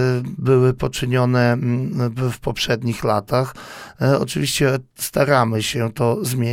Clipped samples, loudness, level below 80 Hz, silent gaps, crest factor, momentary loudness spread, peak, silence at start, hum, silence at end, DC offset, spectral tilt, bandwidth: under 0.1%; -19 LUFS; -46 dBFS; none; 18 dB; 7 LU; -2 dBFS; 0 s; none; 0 s; under 0.1%; -5.5 dB/octave; 16.5 kHz